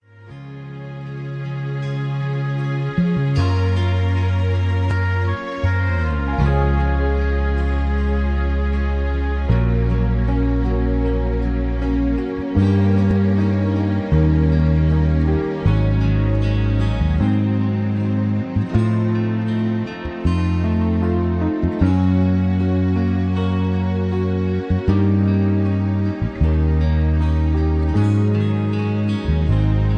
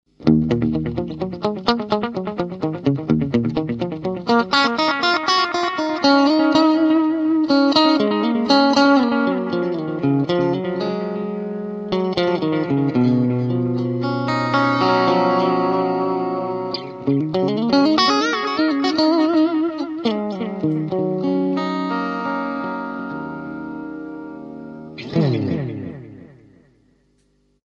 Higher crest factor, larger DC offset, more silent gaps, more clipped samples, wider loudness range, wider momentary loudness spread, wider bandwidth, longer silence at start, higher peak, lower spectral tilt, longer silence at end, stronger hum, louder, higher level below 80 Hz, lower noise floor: about the same, 14 dB vs 18 dB; neither; neither; neither; second, 2 LU vs 10 LU; second, 6 LU vs 12 LU; second, 6.6 kHz vs 7.8 kHz; about the same, 0.2 s vs 0.2 s; second, -4 dBFS vs 0 dBFS; first, -9 dB/octave vs -6.5 dB/octave; second, 0 s vs 1.5 s; neither; about the same, -19 LUFS vs -19 LUFS; first, -24 dBFS vs -52 dBFS; second, -38 dBFS vs -62 dBFS